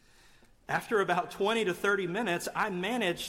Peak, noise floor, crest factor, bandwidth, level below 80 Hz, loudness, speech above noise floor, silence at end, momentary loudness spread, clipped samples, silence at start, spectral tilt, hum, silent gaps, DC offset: -16 dBFS; -59 dBFS; 14 dB; 16.5 kHz; -64 dBFS; -30 LUFS; 29 dB; 0 s; 3 LU; under 0.1%; 0.7 s; -4 dB/octave; none; none; under 0.1%